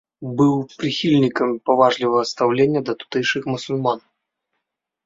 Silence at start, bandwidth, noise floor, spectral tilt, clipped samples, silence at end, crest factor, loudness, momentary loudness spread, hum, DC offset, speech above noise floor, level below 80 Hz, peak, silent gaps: 0.2 s; 7.8 kHz; -79 dBFS; -6 dB/octave; under 0.1%; 1.05 s; 20 dB; -19 LUFS; 8 LU; none; under 0.1%; 60 dB; -62 dBFS; 0 dBFS; none